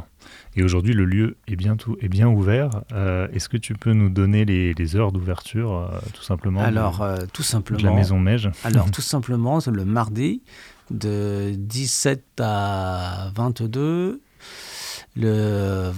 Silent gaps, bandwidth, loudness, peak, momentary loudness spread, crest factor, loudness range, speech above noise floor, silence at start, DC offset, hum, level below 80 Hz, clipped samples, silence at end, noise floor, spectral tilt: none; 15 kHz; -22 LUFS; -4 dBFS; 10 LU; 18 dB; 4 LU; 25 dB; 0 s; under 0.1%; none; -46 dBFS; under 0.1%; 0 s; -45 dBFS; -6 dB/octave